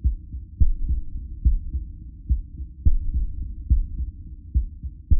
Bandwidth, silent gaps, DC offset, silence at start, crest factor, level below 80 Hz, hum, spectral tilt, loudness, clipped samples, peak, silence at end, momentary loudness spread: 0.6 kHz; none; under 0.1%; 0 s; 16 dB; -24 dBFS; none; -16 dB/octave; -28 LUFS; under 0.1%; -6 dBFS; 0 s; 14 LU